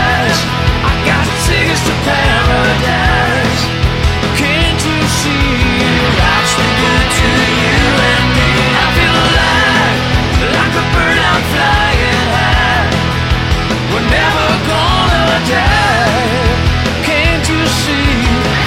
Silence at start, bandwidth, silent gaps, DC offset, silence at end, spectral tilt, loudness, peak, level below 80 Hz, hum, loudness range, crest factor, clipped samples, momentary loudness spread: 0 s; 16.5 kHz; none; under 0.1%; 0 s; -4.5 dB/octave; -11 LUFS; 0 dBFS; -20 dBFS; none; 2 LU; 12 dB; under 0.1%; 3 LU